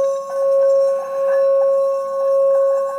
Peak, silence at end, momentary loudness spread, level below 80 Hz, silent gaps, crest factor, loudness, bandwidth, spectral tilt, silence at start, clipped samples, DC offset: -10 dBFS; 0 s; 5 LU; -82 dBFS; none; 6 dB; -17 LUFS; 9.4 kHz; -3 dB/octave; 0 s; under 0.1%; under 0.1%